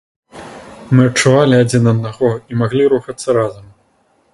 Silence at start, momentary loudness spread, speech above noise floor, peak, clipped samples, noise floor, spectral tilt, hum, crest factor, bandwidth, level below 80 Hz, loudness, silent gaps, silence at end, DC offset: 0.35 s; 20 LU; 44 dB; 0 dBFS; under 0.1%; -57 dBFS; -6 dB/octave; none; 14 dB; 11.5 kHz; -50 dBFS; -14 LUFS; none; 0.7 s; under 0.1%